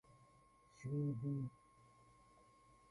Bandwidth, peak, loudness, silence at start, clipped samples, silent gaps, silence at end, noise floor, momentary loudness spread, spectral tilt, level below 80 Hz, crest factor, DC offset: 10.5 kHz; -32 dBFS; -45 LUFS; 0.1 s; under 0.1%; none; 1.4 s; -70 dBFS; 12 LU; -9.5 dB/octave; -76 dBFS; 16 dB; under 0.1%